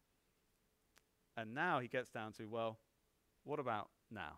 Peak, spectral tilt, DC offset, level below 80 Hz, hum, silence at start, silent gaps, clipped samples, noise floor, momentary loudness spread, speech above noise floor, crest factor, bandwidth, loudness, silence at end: -26 dBFS; -6 dB/octave; under 0.1%; -80 dBFS; none; 1.35 s; none; under 0.1%; -80 dBFS; 15 LU; 37 dB; 20 dB; 15.5 kHz; -44 LUFS; 0 s